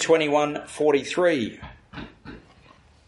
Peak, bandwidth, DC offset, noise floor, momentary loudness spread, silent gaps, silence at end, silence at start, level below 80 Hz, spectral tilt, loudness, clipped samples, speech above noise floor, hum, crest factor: -6 dBFS; 11.5 kHz; under 0.1%; -54 dBFS; 23 LU; none; 0.7 s; 0 s; -54 dBFS; -4 dB/octave; -23 LUFS; under 0.1%; 32 dB; none; 18 dB